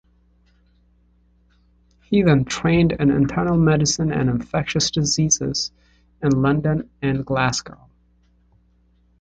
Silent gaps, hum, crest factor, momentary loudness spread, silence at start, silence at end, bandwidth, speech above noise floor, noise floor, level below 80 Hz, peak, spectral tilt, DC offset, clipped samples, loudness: none; 60 Hz at -40 dBFS; 18 dB; 7 LU; 2.1 s; 1.5 s; 9.2 kHz; 40 dB; -59 dBFS; -44 dBFS; -4 dBFS; -5 dB/octave; under 0.1%; under 0.1%; -20 LUFS